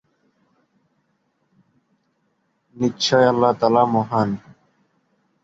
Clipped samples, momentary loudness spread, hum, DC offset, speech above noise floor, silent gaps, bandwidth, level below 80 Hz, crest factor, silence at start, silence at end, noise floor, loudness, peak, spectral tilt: under 0.1%; 9 LU; none; under 0.1%; 51 dB; none; 8 kHz; -60 dBFS; 20 dB; 2.75 s; 1.05 s; -68 dBFS; -19 LUFS; -2 dBFS; -5.5 dB/octave